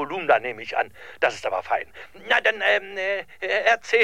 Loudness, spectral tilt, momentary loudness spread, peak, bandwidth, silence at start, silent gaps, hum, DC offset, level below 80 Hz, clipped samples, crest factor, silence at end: -23 LUFS; -2.5 dB/octave; 9 LU; -4 dBFS; 15 kHz; 0 s; none; none; 0.4%; -64 dBFS; under 0.1%; 20 dB; 0 s